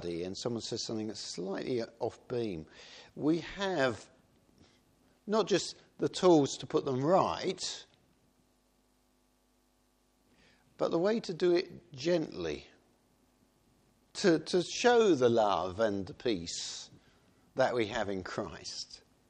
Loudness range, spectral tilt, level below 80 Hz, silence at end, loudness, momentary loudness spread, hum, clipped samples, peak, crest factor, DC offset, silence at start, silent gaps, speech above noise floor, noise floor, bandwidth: 7 LU; -4.5 dB/octave; -66 dBFS; 0.3 s; -32 LUFS; 16 LU; none; under 0.1%; -12 dBFS; 20 dB; under 0.1%; 0 s; none; 40 dB; -72 dBFS; 10 kHz